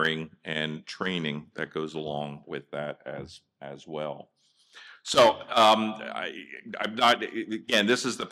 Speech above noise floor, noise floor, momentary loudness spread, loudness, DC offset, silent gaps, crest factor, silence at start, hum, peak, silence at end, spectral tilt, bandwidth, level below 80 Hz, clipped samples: 27 dB; -55 dBFS; 20 LU; -27 LUFS; under 0.1%; none; 20 dB; 0 s; none; -8 dBFS; 0 s; -3.5 dB/octave; 15 kHz; -70 dBFS; under 0.1%